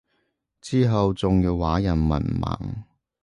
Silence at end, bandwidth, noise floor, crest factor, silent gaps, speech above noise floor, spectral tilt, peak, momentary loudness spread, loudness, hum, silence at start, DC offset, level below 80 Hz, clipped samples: 0.4 s; 11 kHz; -73 dBFS; 14 dB; none; 51 dB; -8 dB/octave; -10 dBFS; 12 LU; -23 LUFS; none; 0.65 s; under 0.1%; -34 dBFS; under 0.1%